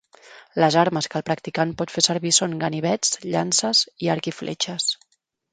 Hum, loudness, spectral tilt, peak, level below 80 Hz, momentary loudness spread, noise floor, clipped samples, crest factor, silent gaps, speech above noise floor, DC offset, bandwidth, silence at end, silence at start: none; -21 LUFS; -3 dB/octave; -2 dBFS; -64 dBFS; 8 LU; -48 dBFS; under 0.1%; 22 dB; none; 26 dB; under 0.1%; 9.6 kHz; 0.55 s; 0.25 s